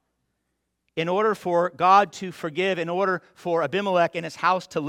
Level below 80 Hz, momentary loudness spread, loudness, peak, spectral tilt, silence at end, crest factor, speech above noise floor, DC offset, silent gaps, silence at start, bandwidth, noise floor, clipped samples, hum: -70 dBFS; 12 LU; -23 LUFS; -6 dBFS; -5.5 dB/octave; 0 s; 18 dB; 54 dB; under 0.1%; none; 0.95 s; 15.5 kHz; -77 dBFS; under 0.1%; none